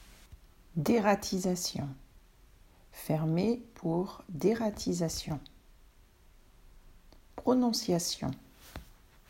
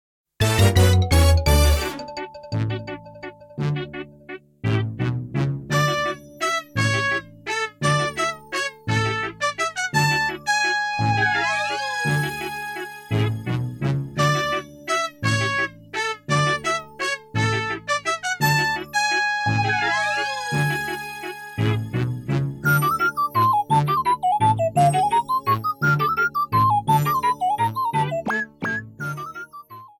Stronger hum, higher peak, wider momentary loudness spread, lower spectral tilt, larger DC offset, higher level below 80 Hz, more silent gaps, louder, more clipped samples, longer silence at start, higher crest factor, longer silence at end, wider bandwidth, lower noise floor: neither; second, -12 dBFS vs -4 dBFS; first, 22 LU vs 11 LU; about the same, -5 dB/octave vs -4.5 dB/octave; neither; second, -56 dBFS vs -34 dBFS; neither; second, -32 LUFS vs -22 LUFS; neither; second, 0 s vs 0.4 s; about the same, 22 dB vs 18 dB; first, 0.45 s vs 0.15 s; about the same, 16 kHz vs 17.5 kHz; first, -60 dBFS vs -42 dBFS